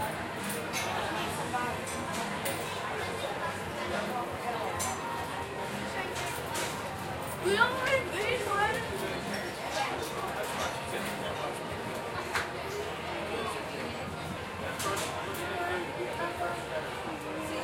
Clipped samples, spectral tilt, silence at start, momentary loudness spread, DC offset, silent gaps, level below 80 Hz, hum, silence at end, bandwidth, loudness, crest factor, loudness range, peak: under 0.1%; -3.5 dB/octave; 0 s; 7 LU; under 0.1%; none; -58 dBFS; none; 0 s; 16.5 kHz; -33 LUFS; 22 dB; 4 LU; -12 dBFS